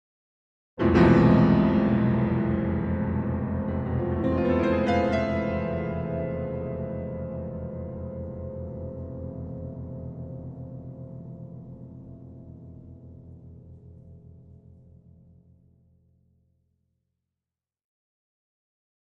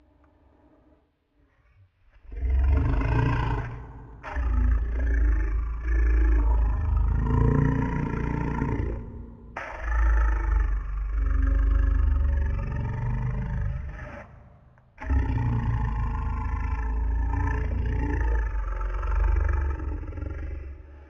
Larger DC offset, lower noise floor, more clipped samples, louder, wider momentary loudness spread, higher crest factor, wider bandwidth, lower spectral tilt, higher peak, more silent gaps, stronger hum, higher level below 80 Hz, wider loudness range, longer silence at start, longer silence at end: neither; first, under -90 dBFS vs -66 dBFS; neither; about the same, -26 LUFS vs -28 LUFS; first, 25 LU vs 13 LU; about the same, 20 dB vs 16 dB; first, 7 kHz vs 3.4 kHz; about the same, -9.5 dB/octave vs -9 dB/octave; about the same, -8 dBFS vs -8 dBFS; neither; neither; second, -44 dBFS vs -26 dBFS; first, 23 LU vs 5 LU; second, 0.75 s vs 2.25 s; first, 4.65 s vs 0.05 s